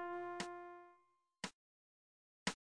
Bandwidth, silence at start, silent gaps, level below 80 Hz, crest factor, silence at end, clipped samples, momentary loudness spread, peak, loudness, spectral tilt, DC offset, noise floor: 10.5 kHz; 0 s; 1.54-2.46 s; -80 dBFS; 26 dB; 0.2 s; under 0.1%; 13 LU; -24 dBFS; -48 LUFS; -3 dB/octave; under 0.1%; -76 dBFS